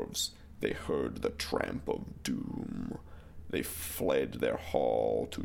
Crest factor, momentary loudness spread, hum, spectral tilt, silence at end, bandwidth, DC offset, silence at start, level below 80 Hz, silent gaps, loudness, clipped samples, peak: 20 dB; 9 LU; none; -4.5 dB/octave; 0 s; 17 kHz; under 0.1%; 0 s; -52 dBFS; none; -34 LUFS; under 0.1%; -14 dBFS